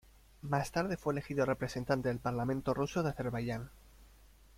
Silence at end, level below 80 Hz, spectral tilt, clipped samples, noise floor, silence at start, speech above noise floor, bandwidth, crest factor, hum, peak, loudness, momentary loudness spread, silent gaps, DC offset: 0.3 s; -56 dBFS; -6.5 dB/octave; under 0.1%; -60 dBFS; 0.45 s; 25 dB; 16.5 kHz; 20 dB; none; -16 dBFS; -35 LUFS; 6 LU; none; under 0.1%